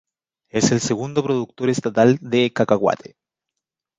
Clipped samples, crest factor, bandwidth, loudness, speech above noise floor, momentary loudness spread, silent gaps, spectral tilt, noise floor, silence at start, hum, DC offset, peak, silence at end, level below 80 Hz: under 0.1%; 18 dB; 9.4 kHz; -20 LUFS; 64 dB; 6 LU; none; -5 dB/octave; -83 dBFS; 0.55 s; none; under 0.1%; -2 dBFS; 1.05 s; -58 dBFS